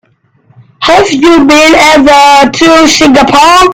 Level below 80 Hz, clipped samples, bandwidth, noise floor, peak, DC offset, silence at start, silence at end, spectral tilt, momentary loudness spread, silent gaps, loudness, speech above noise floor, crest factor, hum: -32 dBFS; 10%; over 20 kHz; -46 dBFS; 0 dBFS; under 0.1%; 0.8 s; 0 s; -3 dB/octave; 4 LU; none; -3 LUFS; 43 dB; 4 dB; none